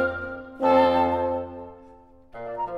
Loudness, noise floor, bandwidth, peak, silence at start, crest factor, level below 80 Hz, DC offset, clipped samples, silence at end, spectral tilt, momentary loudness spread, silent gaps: -23 LUFS; -50 dBFS; 5.8 kHz; -6 dBFS; 0 s; 18 dB; -52 dBFS; under 0.1%; under 0.1%; 0 s; -7 dB/octave; 21 LU; none